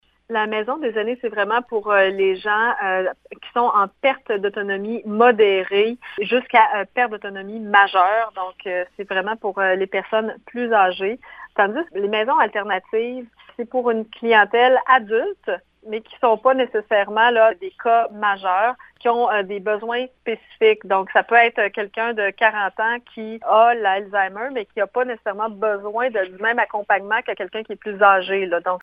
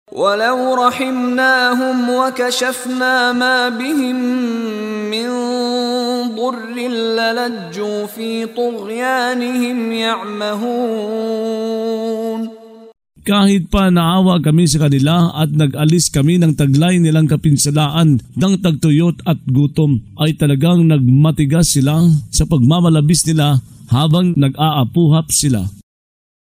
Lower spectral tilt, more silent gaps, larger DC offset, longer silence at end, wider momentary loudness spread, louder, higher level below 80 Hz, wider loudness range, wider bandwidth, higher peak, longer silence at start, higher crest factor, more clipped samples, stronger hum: first, -7 dB/octave vs -5.5 dB/octave; neither; neither; second, 0.05 s vs 0.7 s; first, 12 LU vs 8 LU; second, -19 LUFS vs -15 LUFS; second, -66 dBFS vs -36 dBFS; second, 3 LU vs 6 LU; second, 5.2 kHz vs 16 kHz; about the same, 0 dBFS vs 0 dBFS; first, 0.3 s vs 0.15 s; first, 20 dB vs 14 dB; neither; neither